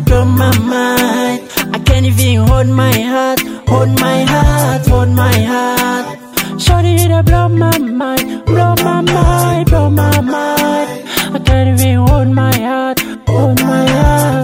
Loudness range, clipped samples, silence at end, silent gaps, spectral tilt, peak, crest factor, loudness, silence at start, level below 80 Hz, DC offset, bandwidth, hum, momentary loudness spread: 1 LU; under 0.1%; 0 s; none; -5.5 dB/octave; 0 dBFS; 10 dB; -11 LUFS; 0 s; -20 dBFS; under 0.1%; 16.5 kHz; none; 5 LU